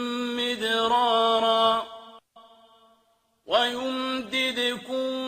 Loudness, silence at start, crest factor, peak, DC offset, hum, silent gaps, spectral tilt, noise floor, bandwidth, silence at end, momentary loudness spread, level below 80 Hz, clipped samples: -24 LUFS; 0 s; 18 dB; -8 dBFS; under 0.1%; none; none; -2.5 dB/octave; -67 dBFS; 15.5 kHz; 0 s; 8 LU; -68 dBFS; under 0.1%